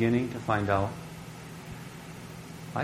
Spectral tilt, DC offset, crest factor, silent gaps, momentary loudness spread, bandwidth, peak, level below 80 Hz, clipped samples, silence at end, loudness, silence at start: -6.5 dB/octave; under 0.1%; 22 dB; none; 16 LU; 16 kHz; -10 dBFS; -54 dBFS; under 0.1%; 0 s; -31 LUFS; 0 s